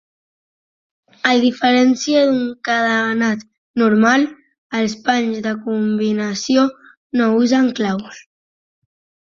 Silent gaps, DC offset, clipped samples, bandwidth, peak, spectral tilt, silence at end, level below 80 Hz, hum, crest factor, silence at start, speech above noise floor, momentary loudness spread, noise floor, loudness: 3.58-3.74 s, 4.58-4.70 s, 6.97-7.10 s; under 0.1%; under 0.1%; 7.4 kHz; -2 dBFS; -4.5 dB/octave; 1.15 s; -62 dBFS; none; 16 dB; 1.25 s; over 74 dB; 9 LU; under -90 dBFS; -17 LUFS